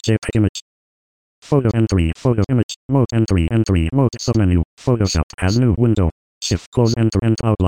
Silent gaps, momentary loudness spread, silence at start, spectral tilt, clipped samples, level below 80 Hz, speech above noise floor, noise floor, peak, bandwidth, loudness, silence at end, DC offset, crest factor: 0.49-0.55 s, 0.62-1.42 s, 2.63-2.69 s, 2.76-2.89 s, 4.65-4.77 s, 5.23-5.38 s, 6.12-6.41 s, 6.66-6.72 s; 4 LU; 0.05 s; -6.5 dB/octave; under 0.1%; -32 dBFS; over 74 dB; under -90 dBFS; -2 dBFS; 10.5 kHz; -18 LUFS; 0 s; 0.3%; 14 dB